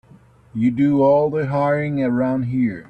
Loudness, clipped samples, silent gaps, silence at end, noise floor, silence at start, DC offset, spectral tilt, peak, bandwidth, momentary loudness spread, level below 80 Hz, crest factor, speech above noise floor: -19 LUFS; under 0.1%; none; 0.05 s; -49 dBFS; 0.55 s; under 0.1%; -10 dB/octave; -6 dBFS; 5.2 kHz; 6 LU; -54 dBFS; 12 dB; 31 dB